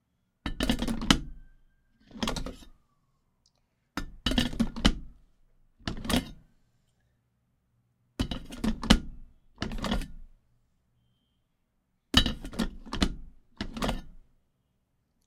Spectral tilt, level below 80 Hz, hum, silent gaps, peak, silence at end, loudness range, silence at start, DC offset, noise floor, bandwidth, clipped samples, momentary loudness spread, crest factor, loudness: -4 dB/octave; -38 dBFS; none; none; -4 dBFS; 1.05 s; 5 LU; 0.45 s; under 0.1%; -75 dBFS; 16 kHz; under 0.1%; 18 LU; 30 dB; -31 LUFS